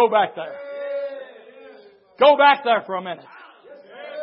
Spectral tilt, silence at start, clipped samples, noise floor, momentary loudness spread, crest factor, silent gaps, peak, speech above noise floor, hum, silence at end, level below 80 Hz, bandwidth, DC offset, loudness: -8 dB/octave; 0 s; under 0.1%; -47 dBFS; 22 LU; 18 dB; none; -2 dBFS; 29 dB; none; 0 s; -84 dBFS; 5.6 kHz; under 0.1%; -18 LUFS